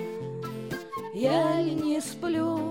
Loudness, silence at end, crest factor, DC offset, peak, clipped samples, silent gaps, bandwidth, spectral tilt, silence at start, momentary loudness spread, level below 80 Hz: -29 LUFS; 0 s; 14 dB; under 0.1%; -14 dBFS; under 0.1%; none; 16.5 kHz; -6 dB/octave; 0 s; 11 LU; -64 dBFS